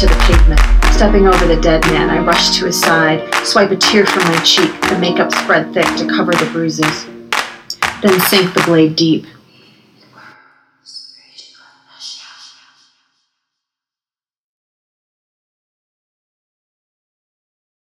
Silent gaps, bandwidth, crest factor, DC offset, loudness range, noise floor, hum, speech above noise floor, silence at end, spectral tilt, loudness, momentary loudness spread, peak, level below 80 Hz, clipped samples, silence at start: none; 16 kHz; 14 dB; under 0.1%; 5 LU; under -90 dBFS; none; over 78 dB; 5.55 s; -4 dB/octave; -12 LUFS; 14 LU; 0 dBFS; -20 dBFS; under 0.1%; 0 s